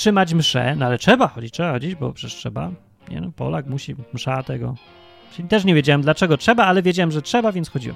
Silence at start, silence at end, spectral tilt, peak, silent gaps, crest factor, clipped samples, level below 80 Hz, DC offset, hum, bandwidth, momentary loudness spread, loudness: 0 s; 0 s; -5.5 dB/octave; 0 dBFS; none; 20 dB; under 0.1%; -50 dBFS; under 0.1%; none; 14.5 kHz; 16 LU; -19 LUFS